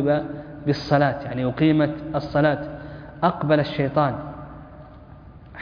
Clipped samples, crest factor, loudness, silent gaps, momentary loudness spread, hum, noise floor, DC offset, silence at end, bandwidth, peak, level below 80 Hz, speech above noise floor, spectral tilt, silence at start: under 0.1%; 18 dB; -22 LUFS; none; 19 LU; none; -44 dBFS; under 0.1%; 0 s; 5.2 kHz; -4 dBFS; -48 dBFS; 22 dB; -8.5 dB/octave; 0 s